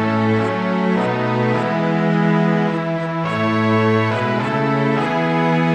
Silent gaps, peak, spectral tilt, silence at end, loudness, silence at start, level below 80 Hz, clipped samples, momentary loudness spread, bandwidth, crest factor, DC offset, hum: none; -4 dBFS; -7.5 dB/octave; 0 s; -18 LUFS; 0 s; -58 dBFS; under 0.1%; 3 LU; 8.8 kHz; 12 dB; under 0.1%; none